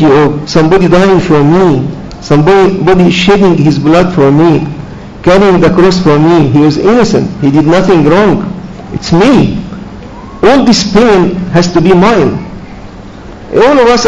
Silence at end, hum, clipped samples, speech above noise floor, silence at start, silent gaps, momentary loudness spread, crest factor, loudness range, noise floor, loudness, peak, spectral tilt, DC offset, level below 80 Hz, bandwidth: 0 s; none; 6%; 21 dB; 0 s; none; 14 LU; 6 dB; 2 LU; -26 dBFS; -6 LUFS; 0 dBFS; -6.5 dB/octave; under 0.1%; -28 dBFS; 8.8 kHz